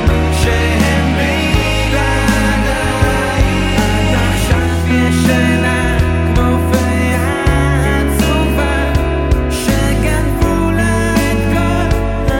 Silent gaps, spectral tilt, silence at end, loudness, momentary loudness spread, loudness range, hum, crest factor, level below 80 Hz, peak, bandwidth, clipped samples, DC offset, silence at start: none; -5.5 dB/octave; 0 s; -13 LUFS; 2 LU; 1 LU; none; 12 dB; -18 dBFS; -2 dBFS; 17 kHz; under 0.1%; under 0.1%; 0 s